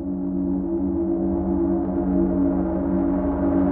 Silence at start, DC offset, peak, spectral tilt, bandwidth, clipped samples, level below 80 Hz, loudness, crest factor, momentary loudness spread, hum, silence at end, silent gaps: 0 s; under 0.1%; -10 dBFS; -12 dB/octave; 2.5 kHz; under 0.1%; -36 dBFS; -23 LUFS; 12 dB; 3 LU; none; 0 s; none